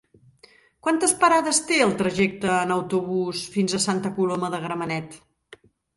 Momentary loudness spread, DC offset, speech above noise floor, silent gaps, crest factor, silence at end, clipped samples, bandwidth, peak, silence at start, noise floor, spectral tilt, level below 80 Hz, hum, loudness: 10 LU; under 0.1%; 33 dB; none; 20 dB; 0.8 s; under 0.1%; 12 kHz; -4 dBFS; 0.85 s; -55 dBFS; -3.5 dB/octave; -62 dBFS; none; -23 LUFS